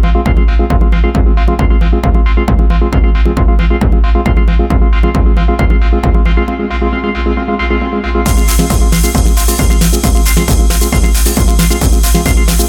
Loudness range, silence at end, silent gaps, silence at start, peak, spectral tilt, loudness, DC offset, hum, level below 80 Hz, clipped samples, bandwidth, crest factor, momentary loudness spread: 2 LU; 0 s; none; 0 s; 0 dBFS; -5.5 dB/octave; -11 LUFS; under 0.1%; none; -10 dBFS; under 0.1%; 17.5 kHz; 8 dB; 3 LU